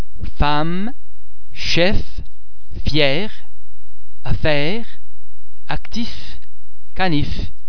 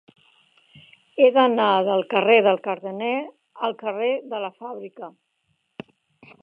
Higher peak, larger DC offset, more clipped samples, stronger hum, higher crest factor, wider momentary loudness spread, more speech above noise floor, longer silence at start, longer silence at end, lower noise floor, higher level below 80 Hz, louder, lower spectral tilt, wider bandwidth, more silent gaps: first, 0 dBFS vs -4 dBFS; first, 30% vs under 0.1%; neither; neither; about the same, 22 dB vs 20 dB; about the same, 21 LU vs 23 LU; second, 32 dB vs 50 dB; second, 0.15 s vs 1.15 s; second, 0 s vs 1.35 s; second, -48 dBFS vs -71 dBFS; first, -28 dBFS vs -80 dBFS; about the same, -21 LUFS vs -21 LUFS; second, -5.5 dB/octave vs -7.5 dB/octave; first, 5.4 kHz vs 4.9 kHz; neither